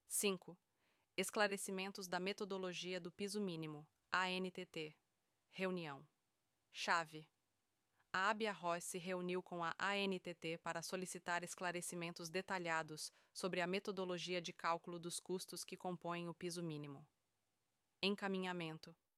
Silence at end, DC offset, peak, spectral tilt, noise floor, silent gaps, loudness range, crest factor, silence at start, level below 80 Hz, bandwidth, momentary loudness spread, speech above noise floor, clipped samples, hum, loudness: 0.25 s; under 0.1%; -22 dBFS; -3.5 dB/octave; -89 dBFS; none; 4 LU; 24 dB; 0.1 s; -90 dBFS; 15.5 kHz; 11 LU; 44 dB; under 0.1%; none; -44 LUFS